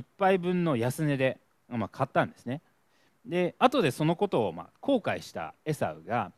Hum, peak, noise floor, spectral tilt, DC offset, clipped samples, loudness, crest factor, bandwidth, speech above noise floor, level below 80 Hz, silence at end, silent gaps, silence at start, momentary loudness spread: none; -6 dBFS; -69 dBFS; -6.5 dB/octave; under 0.1%; under 0.1%; -29 LUFS; 22 dB; 14.5 kHz; 40 dB; -68 dBFS; 0.05 s; none; 0 s; 12 LU